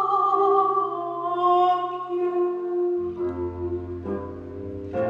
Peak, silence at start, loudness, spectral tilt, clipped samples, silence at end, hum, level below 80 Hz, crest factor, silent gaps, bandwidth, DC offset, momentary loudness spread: -10 dBFS; 0 s; -24 LUFS; -8.5 dB/octave; under 0.1%; 0 s; none; -58 dBFS; 16 dB; none; 5.4 kHz; under 0.1%; 12 LU